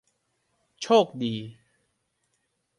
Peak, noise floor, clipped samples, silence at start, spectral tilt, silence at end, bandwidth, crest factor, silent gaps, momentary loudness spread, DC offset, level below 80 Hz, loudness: -8 dBFS; -75 dBFS; under 0.1%; 0.8 s; -5 dB/octave; 1.3 s; 11 kHz; 22 dB; none; 18 LU; under 0.1%; -72 dBFS; -24 LUFS